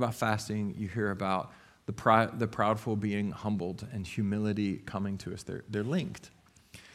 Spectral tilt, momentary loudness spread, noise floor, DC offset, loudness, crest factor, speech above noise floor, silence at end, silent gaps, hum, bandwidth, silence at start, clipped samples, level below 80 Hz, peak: -6.5 dB/octave; 13 LU; -55 dBFS; under 0.1%; -32 LUFS; 24 dB; 24 dB; 0.05 s; none; none; 15 kHz; 0 s; under 0.1%; -62 dBFS; -8 dBFS